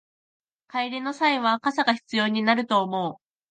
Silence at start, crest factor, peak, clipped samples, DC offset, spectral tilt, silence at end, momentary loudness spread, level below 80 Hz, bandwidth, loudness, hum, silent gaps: 0.75 s; 18 dB; -6 dBFS; under 0.1%; under 0.1%; -5 dB/octave; 0.35 s; 8 LU; -76 dBFS; 9.2 kHz; -24 LUFS; none; none